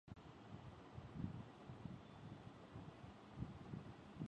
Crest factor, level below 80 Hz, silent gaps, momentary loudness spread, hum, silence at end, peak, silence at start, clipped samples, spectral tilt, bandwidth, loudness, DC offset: 22 dB; -66 dBFS; none; 7 LU; none; 0 s; -32 dBFS; 0.05 s; under 0.1%; -7.5 dB/octave; 9.6 kHz; -56 LUFS; under 0.1%